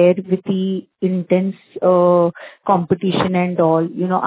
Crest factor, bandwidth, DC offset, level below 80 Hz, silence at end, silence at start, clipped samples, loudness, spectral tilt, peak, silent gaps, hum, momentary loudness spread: 16 dB; 4 kHz; under 0.1%; -56 dBFS; 0 s; 0 s; under 0.1%; -17 LUFS; -11.5 dB/octave; -2 dBFS; none; none; 7 LU